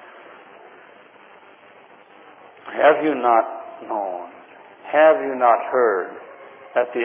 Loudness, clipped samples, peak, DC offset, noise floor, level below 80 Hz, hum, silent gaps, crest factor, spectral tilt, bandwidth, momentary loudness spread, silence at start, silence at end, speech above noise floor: -19 LUFS; under 0.1%; -2 dBFS; under 0.1%; -48 dBFS; under -90 dBFS; none; none; 20 dB; -7.5 dB/octave; 3.6 kHz; 24 LU; 0.15 s; 0 s; 30 dB